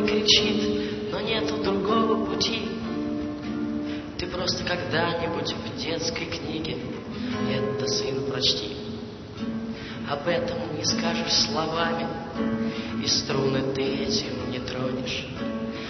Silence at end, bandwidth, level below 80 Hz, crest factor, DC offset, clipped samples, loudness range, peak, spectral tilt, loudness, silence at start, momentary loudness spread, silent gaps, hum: 0 s; 6.4 kHz; -50 dBFS; 20 dB; under 0.1%; under 0.1%; 3 LU; -6 dBFS; -4 dB/octave; -26 LUFS; 0 s; 9 LU; none; none